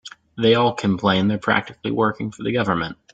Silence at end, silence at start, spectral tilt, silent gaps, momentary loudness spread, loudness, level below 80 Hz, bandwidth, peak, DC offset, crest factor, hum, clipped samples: 0.2 s; 0.05 s; -6.5 dB/octave; none; 8 LU; -20 LUFS; -54 dBFS; 9 kHz; -2 dBFS; under 0.1%; 18 dB; none; under 0.1%